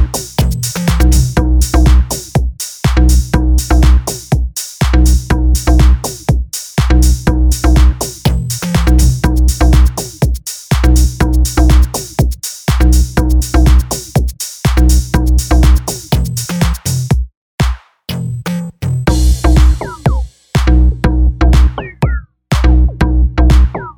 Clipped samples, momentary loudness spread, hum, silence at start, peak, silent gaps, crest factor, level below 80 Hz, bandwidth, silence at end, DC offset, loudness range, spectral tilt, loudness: under 0.1%; 7 LU; none; 0 s; 0 dBFS; 17.37-17.58 s; 10 dB; -12 dBFS; 19.5 kHz; 0.05 s; 0.2%; 3 LU; -5.5 dB/octave; -13 LUFS